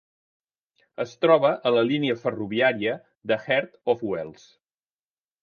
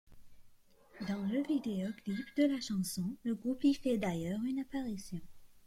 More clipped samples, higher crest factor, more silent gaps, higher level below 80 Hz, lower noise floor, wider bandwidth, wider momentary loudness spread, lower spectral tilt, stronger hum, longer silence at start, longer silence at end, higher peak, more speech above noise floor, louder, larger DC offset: neither; first, 22 dB vs 16 dB; first, 3.17-3.21 s vs none; about the same, -68 dBFS vs -64 dBFS; first, under -90 dBFS vs -61 dBFS; second, 6.8 kHz vs 15.5 kHz; first, 14 LU vs 9 LU; about the same, -6.5 dB/octave vs -6 dB/octave; neither; first, 1 s vs 0.1 s; first, 1.1 s vs 0 s; first, -4 dBFS vs -20 dBFS; first, over 66 dB vs 26 dB; first, -24 LUFS vs -36 LUFS; neither